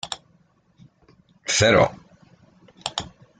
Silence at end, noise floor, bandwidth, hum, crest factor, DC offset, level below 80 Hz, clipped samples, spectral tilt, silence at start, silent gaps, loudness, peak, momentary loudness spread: 0.35 s; -61 dBFS; 9.6 kHz; none; 22 dB; under 0.1%; -54 dBFS; under 0.1%; -3.5 dB/octave; 0.05 s; none; -21 LUFS; -4 dBFS; 18 LU